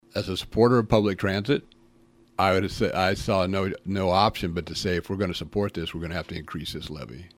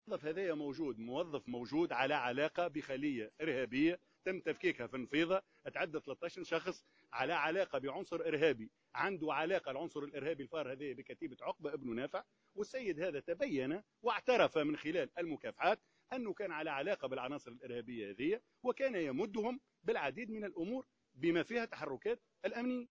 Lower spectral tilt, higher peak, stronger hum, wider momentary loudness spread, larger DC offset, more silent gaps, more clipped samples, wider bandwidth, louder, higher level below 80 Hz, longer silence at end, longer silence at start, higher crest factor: about the same, -6 dB/octave vs -6 dB/octave; first, -4 dBFS vs -16 dBFS; neither; about the same, 12 LU vs 10 LU; neither; neither; neither; first, 16 kHz vs 8 kHz; first, -25 LUFS vs -39 LUFS; first, -46 dBFS vs -76 dBFS; about the same, 0.1 s vs 0.05 s; about the same, 0.15 s vs 0.05 s; about the same, 22 dB vs 22 dB